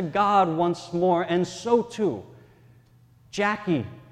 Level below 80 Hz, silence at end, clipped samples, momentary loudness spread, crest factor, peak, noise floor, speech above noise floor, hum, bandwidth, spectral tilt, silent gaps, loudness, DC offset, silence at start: -62 dBFS; 0.1 s; under 0.1%; 8 LU; 18 dB; -8 dBFS; -56 dBFS; 32 dB; none; 10.5 kHz; -6 dB/octave; none; -24 LUFS; under 0.1%; 0 s